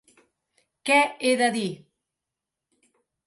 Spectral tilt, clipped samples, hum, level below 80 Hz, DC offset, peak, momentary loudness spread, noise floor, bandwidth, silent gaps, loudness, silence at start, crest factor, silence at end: -3 dB/octave; under 0.1%; none; -78 dBFS; under 0.1%; -8 dBFS; 14 LU; -87 dBFS; 11.5 kHz; none; -23 LUFS; 0.85 s; 20 dB; 1.5 s